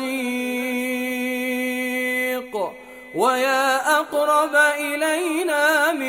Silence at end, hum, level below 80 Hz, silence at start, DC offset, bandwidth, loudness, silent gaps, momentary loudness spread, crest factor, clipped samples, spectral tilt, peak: 0 s; none; -64 dBFS; 0 s; under 0.1%; 17.5 kHz; -21 LUFS; none; 8 LU; 16 dB; under 0.1%; -2 dB/octave; -4 dBFS